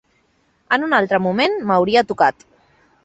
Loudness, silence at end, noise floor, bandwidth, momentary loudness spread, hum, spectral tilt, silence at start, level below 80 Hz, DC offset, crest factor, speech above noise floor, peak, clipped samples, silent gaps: -17 LUFS; 0.75 s; -62 dBFS; 8.2 kHz; 4 LU; none; -6 dB/octave; 0.7 s; -58 dBFS; under 0.1%; 18 dB; 45 dB; -2 dBFS; under 0.1%; none